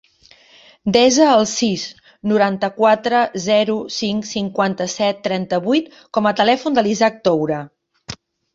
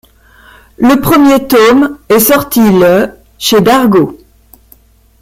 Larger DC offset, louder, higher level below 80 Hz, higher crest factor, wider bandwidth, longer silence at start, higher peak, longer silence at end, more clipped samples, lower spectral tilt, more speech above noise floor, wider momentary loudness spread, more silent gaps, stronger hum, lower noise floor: neither; second, -17 LUFS vs -8 LUFS; second, -58 dBFS vs -38 dBFS; first, 18 dB vs 10 dB; second, 8 kHz vs 16.5 kHz; about the same, 0.85 s vs 0.8 s; about the same, 0 dBFS vs 0 dBFS; second, 0.4 s vs 1.05 s; neither; about the same, -4 dB/octave vs -5 dB/octave; second, 33 dB vs 37 dB; first, 13 LU vs 6 LU; neither; neither; first, -50 dBFS vs -44 dBFS